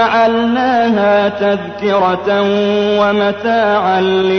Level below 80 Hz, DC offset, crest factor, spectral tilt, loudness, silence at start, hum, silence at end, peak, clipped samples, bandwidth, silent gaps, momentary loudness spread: -56 dBFS; 0.1%; 10 dB; -6.5 dB/octave; -13 LUFS; 0 s; none; 0 s; -4 dBFS; under 0.1%; 6.6 kHz; none; 3 LU